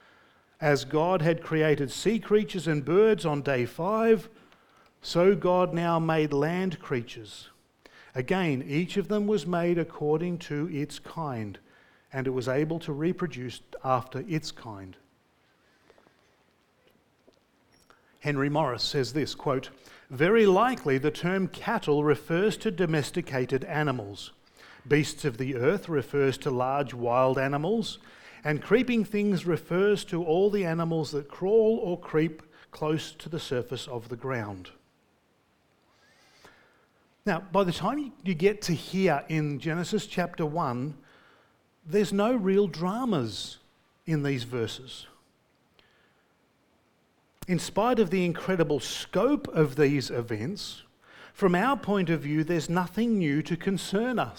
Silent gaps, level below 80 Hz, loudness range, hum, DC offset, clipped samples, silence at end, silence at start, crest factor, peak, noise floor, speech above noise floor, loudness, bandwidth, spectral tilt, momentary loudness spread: none; -58 dBFS; 9 LU; none; under 0.1%; under 0.1%; 0 s; 0.6 s; 18 dB; -10 dBFS; -68 dBFS; 41 dB; -28 LUFS; 18.5 kHz; -6 dB/octave; 12 LU